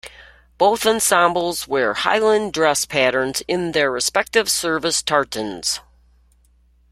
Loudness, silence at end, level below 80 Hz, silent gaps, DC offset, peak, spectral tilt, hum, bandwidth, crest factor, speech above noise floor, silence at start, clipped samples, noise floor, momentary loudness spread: -18 LUFS; 1.1 s; -52 dBFS; none; under 0.1%; 0 dBFS; -2 dB/octave; none; 16.5 kHz; 20 dB; 37 dB; 0.05 s; under 0.1%; -56 dBFS; 7 LU